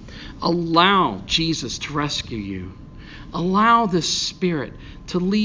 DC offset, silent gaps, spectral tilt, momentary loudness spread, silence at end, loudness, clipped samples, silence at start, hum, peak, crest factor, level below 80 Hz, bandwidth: under 0.1%; none; -4.5 dB/octave; 18 LU; 0 s; -20 LUFS; under 0.1%; 0 s; none; 0 dBFS; 20 dB; -42 dBFS; 7.6 kHz